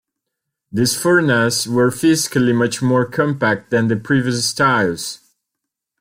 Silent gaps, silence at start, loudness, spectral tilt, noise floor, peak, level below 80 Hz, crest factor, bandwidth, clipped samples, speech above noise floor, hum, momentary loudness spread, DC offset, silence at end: none; 0.75 s; -16 LUFS; -4.5 dB/octave; -81 dBFS; -2 dBFS; -56 dBFS; 14 dB; 16.5 kHz; under 0.1%; 64 dB; none; 5 LU; under 0.1%; 0.85 s